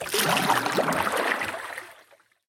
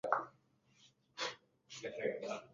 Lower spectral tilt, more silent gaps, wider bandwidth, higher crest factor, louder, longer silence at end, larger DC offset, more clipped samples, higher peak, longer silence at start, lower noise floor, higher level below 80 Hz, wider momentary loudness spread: first, -2.5 dB/octave vs -1 dB/octave; neither; first, 17 kHz vs 7.4 kHz; second, 18 dB vs 28 dB; first, -24 LUFS vs -42 LUFS; first, 0.55 s vs 0.05 s; neither; neither; first, -8 dBFS vs -16 dBFS; about the same, 0 s vs 0.05 s; second, -58 dBFS vs -72 dBFS; first, -64 dBFS vs -84 dBFS; second, 13 LU vs 16 LU